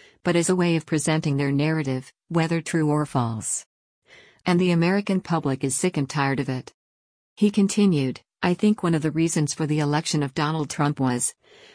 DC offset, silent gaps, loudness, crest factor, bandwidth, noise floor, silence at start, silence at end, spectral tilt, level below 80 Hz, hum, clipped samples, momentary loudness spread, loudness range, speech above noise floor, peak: under 0.1%; 3.66-4.02 s, 6.74-7.36 s; -23 LUFS; 16 dB; 10.5 kHz; under -90 dBFS; 0.25 s; 0.45 s; -5.5 dB/octave; -60 dBFS; none; under 0.1%; 7 LU; 2 LU; over 67 dB; -8 dBFS